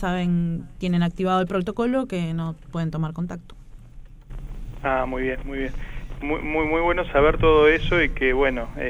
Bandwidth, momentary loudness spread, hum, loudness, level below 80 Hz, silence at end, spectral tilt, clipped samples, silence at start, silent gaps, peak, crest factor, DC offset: 10.5 kHz; 15 LU; none; -23 LUFS; -32 dBFS; 0 s; -7.5 dB/octave; under 0.1%; 0 s; none; -4 dBFS; 18 dB; under 0.1%